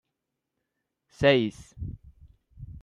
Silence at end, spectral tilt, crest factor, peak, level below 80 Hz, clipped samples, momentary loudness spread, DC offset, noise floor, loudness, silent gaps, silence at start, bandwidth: 0.05 s; -6.5 dB/octave; 22 dB; -8 dBFS; -52 dBFS; under 0.1%; 19 LU; under 0.1%; -84 dBFS; -24 LUFS; none; 1.2 s; 11 kHz